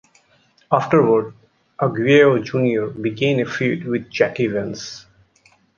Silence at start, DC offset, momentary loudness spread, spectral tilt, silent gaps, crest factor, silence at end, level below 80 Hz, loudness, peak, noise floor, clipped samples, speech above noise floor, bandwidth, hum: 0.7 s; under 0.1%; 14 LU; -6.5 dB/octave; none; 18 dB; 0.75 s; -60 dBFS; -18 LUFS; -2 dBFS; -58 dBFS; under 0.1%; 40 dB; 7.2 kHz; none